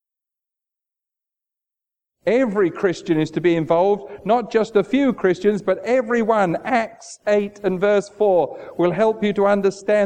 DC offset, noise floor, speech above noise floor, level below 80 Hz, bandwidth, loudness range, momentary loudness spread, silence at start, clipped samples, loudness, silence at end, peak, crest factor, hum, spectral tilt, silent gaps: under 0.1%; -87 dBFS; 69 dB; -58 dBFS; 9.4 kHz; 3 LU; 4 LU; 2.25 s; under 0.1%; -19 LUFS; 0 s; -4 dBFS; 16 dB; none; -6.5 dB/octave; none